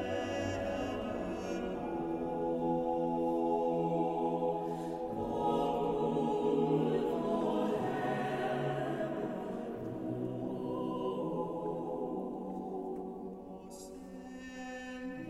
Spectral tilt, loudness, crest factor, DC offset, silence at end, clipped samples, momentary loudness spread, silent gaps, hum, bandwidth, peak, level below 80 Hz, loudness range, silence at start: -7 dB/octave; -35 LUFS; 16 dB; under 0.1%; 0 s; under 0.1%; 11 LU; none; none; 14.5 kHz; -20 dBFS; -60 dBFS; 7 LU; 0 s